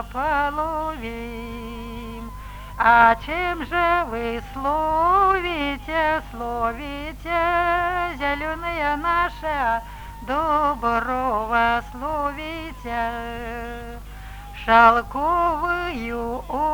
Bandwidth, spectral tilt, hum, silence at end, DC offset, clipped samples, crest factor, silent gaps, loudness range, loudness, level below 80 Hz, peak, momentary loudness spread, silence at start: over 20 kHz; -5.5 dB/octave; 50 Hz at -40 dBFS; 0 s; under 0.1%; under 0.1%; 22 dB; none; 4 LU; -22 LUFS; -38 dBFS; 0 dBFS; 17 LU; 0 s